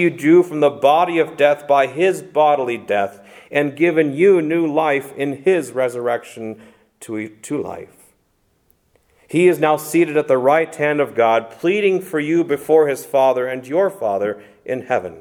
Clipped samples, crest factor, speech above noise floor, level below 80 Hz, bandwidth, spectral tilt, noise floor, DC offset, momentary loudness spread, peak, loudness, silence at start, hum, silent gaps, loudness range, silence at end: under 0.1%; 16 dB; 46 dB; -66 dBFS; 17 kHz; -6 dB/octave; -63 dBFS; under 0.1%; 12 LU; 0 dBFS; -17 LUFS; 0 s; none; none; 7 LU; 0 s